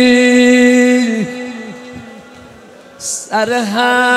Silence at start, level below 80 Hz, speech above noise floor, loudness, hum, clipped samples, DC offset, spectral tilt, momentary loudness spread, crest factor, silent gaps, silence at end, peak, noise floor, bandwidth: 0 s; -56 dBFS; 27 dB; -11 LUFS; none; under 0.1%; under 0.1%; -3.5 dB/octave; 21 LU; 12 dB; none; 0 s; 0 dBFS; -38 dBFS; 13.5 kHz